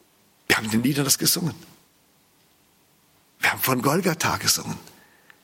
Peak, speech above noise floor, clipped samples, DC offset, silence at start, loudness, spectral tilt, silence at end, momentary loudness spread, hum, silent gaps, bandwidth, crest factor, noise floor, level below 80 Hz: -4 dBFS; 38 dB; under 0.1%; under 0.1%; 0.5 s; -22 LUFS; -3 dB/octave; 0.6 s; 16 LU; none; none; 16.5 kHz; 22 dB; -61 dBFS; -60 dBFS